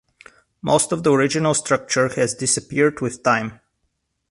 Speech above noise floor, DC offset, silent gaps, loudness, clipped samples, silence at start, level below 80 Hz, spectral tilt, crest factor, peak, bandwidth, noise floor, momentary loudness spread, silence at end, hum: 53 dB; under 0.1%; none; -19 LUFS; under 0.1%; 0.65 s; -56 dBFS; -4 dB/octave; 18 dB; -2 dBFS; 11.5 kHz; -72 dBFS; 4 LU; 0.75 s; none